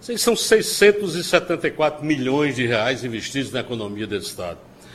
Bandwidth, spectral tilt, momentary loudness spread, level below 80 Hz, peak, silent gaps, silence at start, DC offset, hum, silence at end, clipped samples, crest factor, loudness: 14.5 kHz; -3.5 dB/octave; 12 LU; -54 dBFS; -2 dBFS; none; 0 s; under 0.1%; none; 0 s; under 0.1%; 20 dB; -20 LUFS